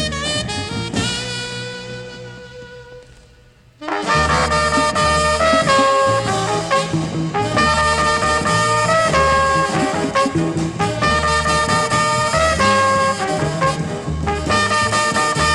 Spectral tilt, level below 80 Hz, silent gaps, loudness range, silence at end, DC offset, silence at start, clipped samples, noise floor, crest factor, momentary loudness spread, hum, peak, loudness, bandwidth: -4 dB/octave; -34 dBFS; none; 8 LU; 0 s; under 0.1%; 0 s; under 0.1%; -48 dBFS; 16 dB; 11 LU; none; -2 dBFS; -16 LUFS; 14 kHz